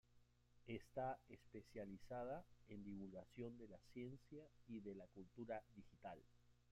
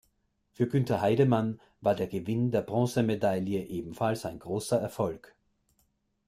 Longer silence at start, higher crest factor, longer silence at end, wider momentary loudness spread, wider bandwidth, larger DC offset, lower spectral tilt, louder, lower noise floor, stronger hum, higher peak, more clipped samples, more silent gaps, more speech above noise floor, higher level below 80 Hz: second, 0.1 s vs 0.6 s; about the same, 18 dB vs 18 dB; second, 0 s vs 1.1 s; about the same, 11 LU vs 10 LU; about the same, 14.5 kHz vs 15.5 kHz; neither; about the same, -7.5 dB/octave vs -7 dB/octave; second, -56 LUFS vs -29 LUFS; about the same, -75 dBFS vs -74 dBFS; neither; second, -38 dBFS vs -12 dBFS; neither; neither; second, 20 dB vs 45 dB; second, -76 dBFS vs -62 dBFS